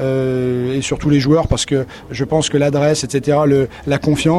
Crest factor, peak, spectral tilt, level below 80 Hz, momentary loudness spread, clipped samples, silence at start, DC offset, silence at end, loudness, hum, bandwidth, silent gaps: 14 dB; 0 dBFS; -5.5 dB/octave; -36 dBFS; 5 LU; under 0.1%; 0 s; under 0.1%; 0 s; -16 LUFS; none; 12.5 kHz; none